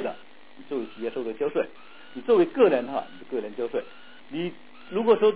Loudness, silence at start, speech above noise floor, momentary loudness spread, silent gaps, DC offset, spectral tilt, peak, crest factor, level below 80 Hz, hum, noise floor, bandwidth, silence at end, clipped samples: -27 LUFS; 0 s; 25 dB; 15 LU; none; 0.6%; -9.5 dB/octave; -6 dBFS; 20 dB; -74 dBFS; none; -50 dBFS; 4 kHz; 0 s; under 0.1%